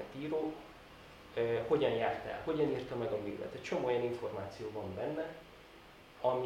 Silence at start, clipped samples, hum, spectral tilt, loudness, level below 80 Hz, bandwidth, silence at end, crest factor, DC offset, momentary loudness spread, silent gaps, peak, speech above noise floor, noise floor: 0 s; under 0.1%; none; -6.5 dB/octave; -37 LUFS; -66 dBFS; 16 kHz; 0 s; 18 dB; under 0.1%; 22 LU; none; -18 dBFS; 21 dB; -57 dBFS